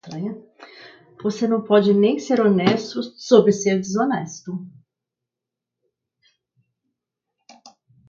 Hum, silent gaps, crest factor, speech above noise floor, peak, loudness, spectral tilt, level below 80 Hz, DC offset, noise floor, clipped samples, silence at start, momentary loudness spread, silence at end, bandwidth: none; none; 22 dB; 67 dB; 0 dBFS; -19 LUFS; -6 dB/octave; -68 dBFS; under 0.1%; -86 dBFS; under 0.1%; 0.05 s; 16 LU; 3.4 s; 7.6 kHz